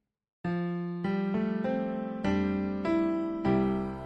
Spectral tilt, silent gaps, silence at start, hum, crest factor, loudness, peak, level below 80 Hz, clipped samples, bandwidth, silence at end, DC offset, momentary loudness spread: -9 dB/octave; none; 0.45 s; none; 14 dB; -30 LUFS; -16 dBFS; -54 dBFS; under 0.1%; 7.8 kHz; 0 s; under 0.1%; 6 LU